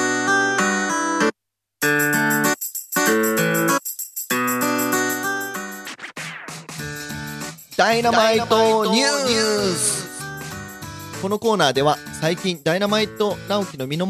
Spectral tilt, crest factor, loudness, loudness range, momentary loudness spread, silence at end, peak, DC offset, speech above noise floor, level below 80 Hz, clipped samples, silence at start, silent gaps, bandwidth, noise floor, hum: -3 dB/octave; 20 dB; -20 LUFS; 5 LU; 14 LU; 0 s; -2 dBFS; under 0.1%; 51 dB; -56 dBFS; under 0.1%; 0 s; none; 15.5 kHz; -70 dBFS; none